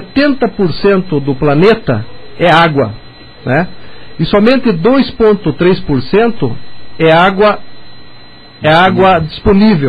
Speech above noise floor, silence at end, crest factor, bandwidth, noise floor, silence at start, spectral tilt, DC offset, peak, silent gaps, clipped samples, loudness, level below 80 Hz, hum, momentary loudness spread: 26 dB; 0 s; 10 dB; 9.8 kHz; -35 dBFS; 0 s; -8 dB/octave; under 0.1%; 0 dBFS; none; under 0.1%; -10 LUFS; -32 dBFS; none; 11 LU